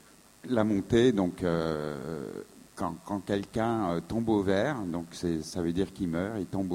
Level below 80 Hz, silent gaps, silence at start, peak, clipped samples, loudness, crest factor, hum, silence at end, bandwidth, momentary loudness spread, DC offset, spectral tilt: -54 dBFS; none; 0.45 s; -10 dBFS; under 0.1%; -30 LUFS; 20 dB; none; 0 s; 16 kHz; 11 LU; under 0.1%; -6.5 dB/octave